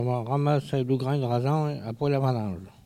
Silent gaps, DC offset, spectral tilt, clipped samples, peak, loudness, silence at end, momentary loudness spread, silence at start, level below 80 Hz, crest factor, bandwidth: none; under 0.1%; -8.5 dB/octave; under 0.1%; -12 dBFS; -27 LUFS; 0.15 s; 5 LU; 0 s; -60 dBFS; 14 dB; 12.5 kHz